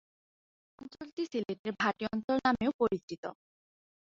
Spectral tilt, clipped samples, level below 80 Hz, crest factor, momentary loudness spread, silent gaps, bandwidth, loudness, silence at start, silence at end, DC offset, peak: -6 dB/octave; under 0.1%; -68 dBFS; 22 dB; 16 LU; 1.12-1.17 s, 1.59-1.64 s, 2.24-2.28 s, 2.74-2.79 s, 3.03-3.08 s, 3.18-3.23 s; 7.6 kHz; -33 LUFS; 0.8 s; 0.85 s; under 0.1%; -12 dBFS